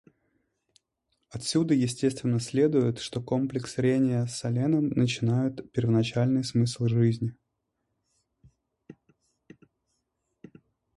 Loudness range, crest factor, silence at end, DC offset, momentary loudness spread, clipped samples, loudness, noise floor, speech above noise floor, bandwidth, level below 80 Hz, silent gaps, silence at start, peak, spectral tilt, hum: 5 LU; 16 dB; 2.05 s; under 0.1%; 6 LU; under 0.1%; -27 LUFS; -80 dBFS; 54 dB; 11.5 kHz; -62 dBFS; none; 1.35 s; -12 dBFS; -6.5 dB/octave; none